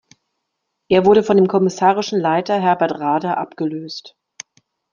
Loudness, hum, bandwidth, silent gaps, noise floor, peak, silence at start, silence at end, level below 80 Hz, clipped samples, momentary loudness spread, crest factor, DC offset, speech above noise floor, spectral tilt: -17 LUFS; none; 7.4 kHz; none; -76 dBFS; -2 dBFS; 0.9 s; 0.85 s; -58 dBFS; under 0.1%; 21 LU; 16 dB; under 0.1%; 59 dB; -6 dB/octave